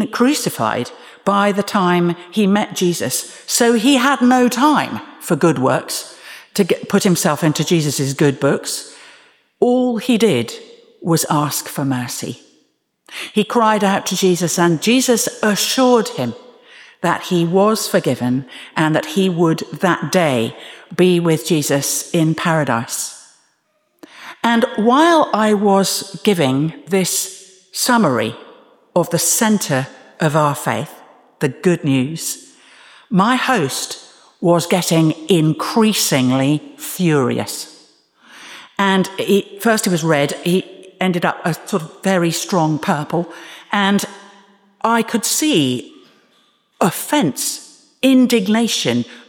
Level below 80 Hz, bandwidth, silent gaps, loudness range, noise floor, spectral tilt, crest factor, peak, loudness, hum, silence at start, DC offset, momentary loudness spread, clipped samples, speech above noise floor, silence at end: -64 dBFS; over 20 kHz; none; 4 LU; -64 dBFS; -4.5 dB/octave; 16 dB; -2 dBFS; -16 LUFS; none; 0 s; under 0.1%; 11 LU; under 0.1%; 48 dB; 0.1 s